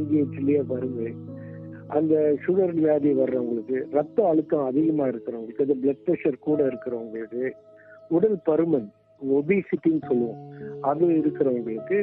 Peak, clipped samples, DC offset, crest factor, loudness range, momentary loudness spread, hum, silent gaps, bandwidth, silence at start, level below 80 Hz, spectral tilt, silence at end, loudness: -8 dBFS; under 0.1%; under 0.1%; 16 dB; 3 LU; 11 LU; none; none; 3.8 kHz; 0 s; -68 dBFS; -12 dB/octave; 0 s; -24 LUFS